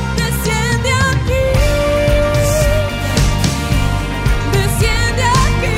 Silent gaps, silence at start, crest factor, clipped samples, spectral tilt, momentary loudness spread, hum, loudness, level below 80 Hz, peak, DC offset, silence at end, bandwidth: none; 0 s; 10 dB; under 0.1%; -5 dB/octave; 3 LU; none; -15 LUFS; -20 dBFS; -2 dBFS; under 0.1%; 0 s; 16.5 kHz